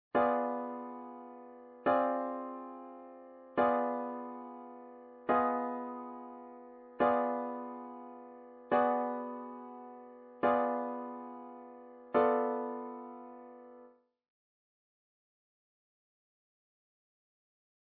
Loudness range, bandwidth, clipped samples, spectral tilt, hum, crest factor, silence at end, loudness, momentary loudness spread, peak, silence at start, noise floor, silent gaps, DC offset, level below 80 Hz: 3 LU; 4.5 kHz; under 0.1%; -4 dB/octave; none; 22 dB; 4 s; -34 LUFS; 22 LU; -16 dBFS; 0.15 s; -60 dBFS; none; under 0.1%; -78 dBFS